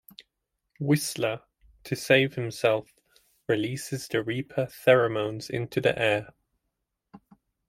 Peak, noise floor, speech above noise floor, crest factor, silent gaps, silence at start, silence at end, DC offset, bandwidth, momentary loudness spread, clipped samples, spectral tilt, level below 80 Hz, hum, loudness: -6 dBFS; -81 dBFS; 55 dB; 22 dB; none; 0.8 s; 0.5 s; under 0.1%; 16.5 kHz; 12 LU; under 0.1%; -5 dB/octave; -64 dBFS; none; -26 LUFS